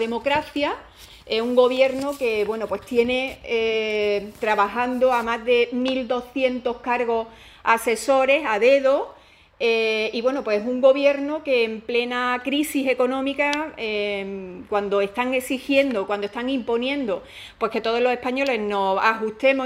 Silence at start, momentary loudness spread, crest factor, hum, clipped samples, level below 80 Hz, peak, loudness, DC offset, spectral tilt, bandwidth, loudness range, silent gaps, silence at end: 0 s; 8 LU; 18 dB; none; under 0.1%; -56 dBFS; -4 dBFS; -22 LUFS; under 0.1%; -4 dB/octave; 16 kHz; 3 LU; none; 0 s